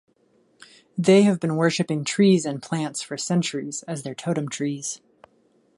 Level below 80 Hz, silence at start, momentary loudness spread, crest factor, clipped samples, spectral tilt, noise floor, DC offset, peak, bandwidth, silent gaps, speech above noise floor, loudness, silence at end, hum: -70 dBFS; 0.95 s; 13 LU; 18 dB; under 0.1%; -5.5 dB/octave; -63 dBFS; under 0.1%; -4 dBFS; 11.5 kHz; none; 41 dB; -23 LUFS; 0.8 s; none